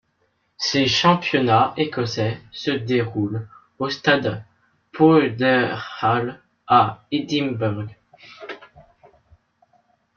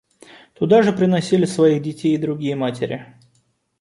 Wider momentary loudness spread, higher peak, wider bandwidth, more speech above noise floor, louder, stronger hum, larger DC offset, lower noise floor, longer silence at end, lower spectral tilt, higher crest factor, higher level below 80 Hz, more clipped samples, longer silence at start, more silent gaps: first, 19 LU vs 11 LU; about the same, -2 dBFS vs -2 dBFS; second, 7.2 kHz vs 11.5 kHz; about the same, 48 dB vs 46 dB; about the same, -20 LUFS vs -18 LUFS; neither; neither; first, -68 dBFS vs -64 dBFS; first, 1.35 s vs 0.75 s; second, -5.5 dB/octave vs -7 dB/octave; about the same, 18 dB vs 16 dB; about the same, -60 dBFS vs -60 dBFS; neither; about the same, 0.6 s vs 0.6 s; neither